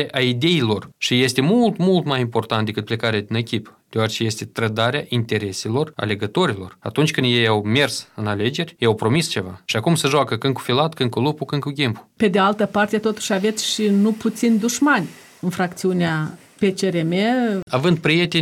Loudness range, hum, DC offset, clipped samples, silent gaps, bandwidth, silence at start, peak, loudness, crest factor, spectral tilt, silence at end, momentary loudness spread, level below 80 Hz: 3 LU; none; under 0.1%; under 0.1%; 17.63-17.67 s; 16.5 kHz; 0 s; -4 dBFS; -20 LUFS; 16 dB; -5 dB/octave; 0 s; 7 LU; -60 dBFS